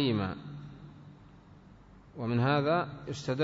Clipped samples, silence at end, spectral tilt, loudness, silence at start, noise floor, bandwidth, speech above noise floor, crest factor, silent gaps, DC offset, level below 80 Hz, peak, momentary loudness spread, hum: under 0.1%; 0 s; -7 dB/octave; -31 LUFS; 0 s; -55 dBFS; 7.8 kHz; 25 dB; 16 dB; none; under 0.1%; -60 dBFS; -16 dBFS; 24 LU; none